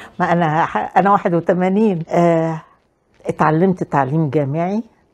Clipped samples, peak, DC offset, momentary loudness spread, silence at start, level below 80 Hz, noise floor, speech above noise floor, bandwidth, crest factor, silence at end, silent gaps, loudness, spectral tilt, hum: under 0.1%; 0 dBFS; under 0.1%; 8 LU; 0 s; -56 dBFS; -57 dBFS; 41 dB; 9.4 kHz; 16 dB; 0.3 s; none; -17 LUFS; -8.5 dB/octave; none